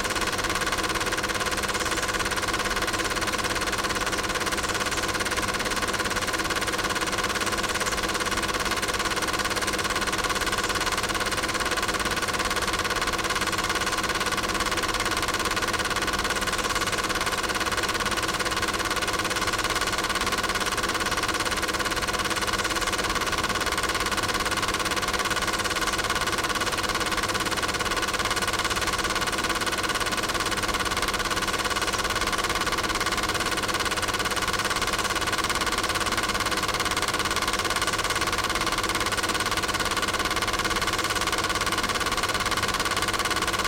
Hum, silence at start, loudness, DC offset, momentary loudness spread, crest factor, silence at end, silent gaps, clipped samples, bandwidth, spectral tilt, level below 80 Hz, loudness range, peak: none; 0 s; -25 LUFS; under 0.1%; 1 LU; 18 dB; 0 s; none; under 0.1%; 17 kHz; -2 dB/octave; -42 dBFS; 1 LU; -8 dBFS